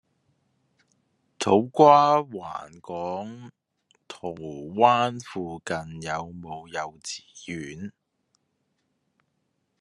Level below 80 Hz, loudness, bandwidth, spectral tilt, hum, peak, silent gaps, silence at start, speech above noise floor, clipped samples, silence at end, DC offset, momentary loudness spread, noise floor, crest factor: -68 dBFS; -24 LUFS; 11.5 kHz; -5 dB/octave; none; -2 dBFS; none; 1.4 s; 51 dB; under 0.1%; 1.9 s; under 0.1%; 20 LU; -75 dBFS; 24 dB